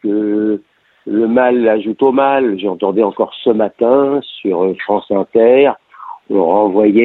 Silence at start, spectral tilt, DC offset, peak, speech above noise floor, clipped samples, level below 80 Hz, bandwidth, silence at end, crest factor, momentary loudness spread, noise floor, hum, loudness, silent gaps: 0.05 s; -9 dB/octave; under 0.1%; 0 dBFS; 33 dB; under 0.1%; -60 dBFS; 4.1 kHz; 0 s; 12 dB; 8 LU; -45 dBFS; none; -14 LUFS; none